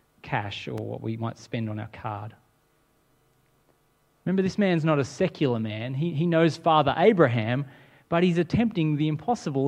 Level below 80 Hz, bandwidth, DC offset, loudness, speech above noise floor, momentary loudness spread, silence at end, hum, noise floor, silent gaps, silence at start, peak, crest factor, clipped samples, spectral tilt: -58 dBFS; 9.6 kHz; under 0.1%; -25 LUFS; 42 dB; 13 LU; 0 s; none; -66 dBFS; none; 0.25 s; -4 dBFS; 22 dB; under 0.1%; -7 dB/octave